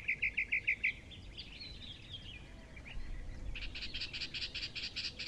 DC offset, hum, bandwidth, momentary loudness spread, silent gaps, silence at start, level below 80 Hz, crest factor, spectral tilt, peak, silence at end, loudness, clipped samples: under 0.1%; none; 11.5 kHz; 17 LU; none; 0 s; -50 dBFS; 18 dB; -2.5 dB/octave; -22 dBFS; 0 s; -39 LUFS; under 0.1%